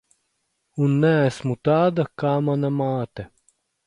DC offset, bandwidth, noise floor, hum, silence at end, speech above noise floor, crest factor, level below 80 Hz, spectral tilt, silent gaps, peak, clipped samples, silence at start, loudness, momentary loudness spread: under 0.1%; 11 kHz; -73 dBFS; none; 0.6 s; 53 dB; 16 dB; -58 dBFS; -8 dB/octave; none; -6 dBFS; under 0.1%; 0.75 s; -21 LUFS; 16 LU